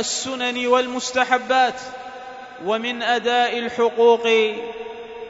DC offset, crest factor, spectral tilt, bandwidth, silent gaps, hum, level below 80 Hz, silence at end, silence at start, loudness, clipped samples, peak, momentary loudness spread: under 0.1%; 20 dB; -1.5 dB/octave; 8 kHz; none; none; -64 dBFS; 0 s; 0 s; -20 LUFS; under 0.1%; -2 dBFS; 17 LU